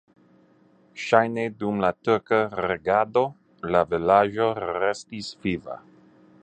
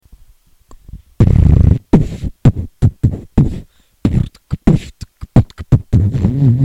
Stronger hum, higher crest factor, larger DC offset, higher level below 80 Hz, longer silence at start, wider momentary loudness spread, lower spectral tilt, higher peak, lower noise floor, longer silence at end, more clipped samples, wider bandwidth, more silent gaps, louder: neither; first, 22 dB vs 14 dB; neither; second, -56 dBFS vs -20 dBFS; about the same, 0.95 s vs 0.95 s; first, 15 LU vs 10 LU; second, -6 dB/octave vs -9.5 dB/octave; about the same, -2 dBFS vs 0 dBFS; first, -58 dBFS vs -46 dBFS; first, 0.65 s vs 0 s; neither; about the same, 9.2 kHz vs 8.4 kHz; neither; second, -24 LUFS vs -14 LUFS